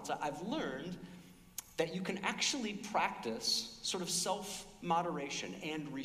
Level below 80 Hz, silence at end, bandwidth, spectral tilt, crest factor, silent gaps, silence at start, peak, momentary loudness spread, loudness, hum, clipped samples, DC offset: -68 dBFS; 0 s; 15.5 kHz; -2.5 dB/octave; 18 dB; none; 0 s; -20 dBFS; 12 LU; -37 LUFS; none; under 0.1%; under 0.1%